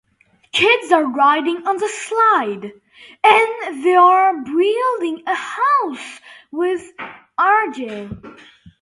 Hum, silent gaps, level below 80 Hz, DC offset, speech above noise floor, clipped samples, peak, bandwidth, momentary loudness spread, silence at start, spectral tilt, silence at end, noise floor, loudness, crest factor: none; none; -58 dBFS; under 0.1%; 41 dB; under 0.1%; 0 dBFS; 11.5 kHz; 18 LU; 0.55 s; -3.5 dB/octave; 0.15 s; -58 dBFS; -16 LUFS; 18 dB